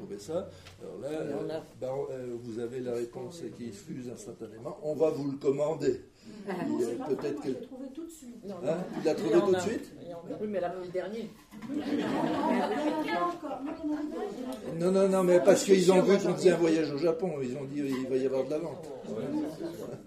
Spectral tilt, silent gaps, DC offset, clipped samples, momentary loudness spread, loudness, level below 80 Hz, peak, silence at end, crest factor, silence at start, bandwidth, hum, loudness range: -6 dB/octave; none; under 0.1%; under 0.1%; 18 LU; -30 LUFS; -66 dBFS; -8 dBFS; 0 s; 22 dB; 0 s; 15 kHz; none; 12 LU